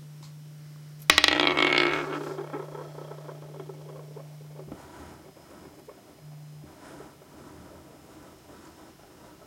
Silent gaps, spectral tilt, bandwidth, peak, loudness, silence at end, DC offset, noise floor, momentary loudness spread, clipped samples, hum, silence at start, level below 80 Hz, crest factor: none; -2.5 dB/octave; 16.5 kHz; 0 dBFS; -23 LUFS; 0.15 s; under 0.1%; -52 dBFS; 28 LU; under 0.1%; none; 0 s; -62 dBFS; 32 dB